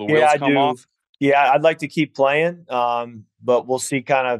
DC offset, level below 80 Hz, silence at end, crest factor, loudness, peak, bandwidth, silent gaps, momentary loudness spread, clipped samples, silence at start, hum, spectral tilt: under 0.1%; -74 dBFS; 0 s; 14 dB; -18 LUFS; -4 dBFS; 12.5 kHz; 1.09-1.13 s; 8 LU; under 0.1%; 0 s; none; -4.5 dB/octave